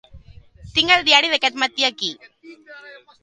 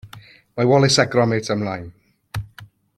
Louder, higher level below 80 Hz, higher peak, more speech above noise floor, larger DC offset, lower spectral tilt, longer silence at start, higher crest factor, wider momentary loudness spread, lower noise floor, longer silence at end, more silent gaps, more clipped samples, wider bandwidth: about the same, -17 LUFS vs -18 LUFS; about the same, -52 dBFS vs -50 dBFS; about the same, 0 dBFS vs -2 dBFS; about the same, 25 dB vs 28 dB; neither; second, -1.5 dB/octave vs -5 dB/octave; about the same, 0.15 s vs 0.05 s; about the same, 22 dB vs 18 dB; second, 12 LU vs 18 LU; about the same, -44 dBFS vs -45 dBFS; about the same, 0.3 s vs 0.3 s; neither; neither; second, 11.5 kHz vs 14 kHz